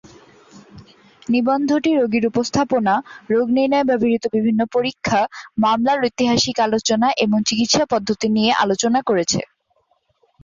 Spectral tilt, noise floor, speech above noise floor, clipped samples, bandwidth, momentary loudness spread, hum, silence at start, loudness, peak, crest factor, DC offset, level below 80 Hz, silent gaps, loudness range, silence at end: -4 dB/octave; -64 dBFS; 46 dB; under 0.1%; 7.6 kHz; 4 LU; none; 0.55 s; -18 LUFS; -4 dBFS; 14 dB; under 0.1%; -54 dBFS; none; 2 LU; 1 s